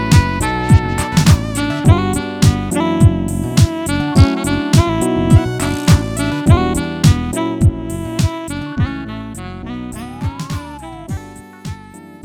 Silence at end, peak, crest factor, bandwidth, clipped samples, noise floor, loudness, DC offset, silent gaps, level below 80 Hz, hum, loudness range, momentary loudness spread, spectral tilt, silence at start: 0.1 s; 0 dBFS; 14 dB; 16.5 kHz; under 0.1%; -36 dBFS; -15 LUFS; under 0.1%; none; -26 dBFS; none; 11 LU; 15 LU; -6 dB/octave; 0 s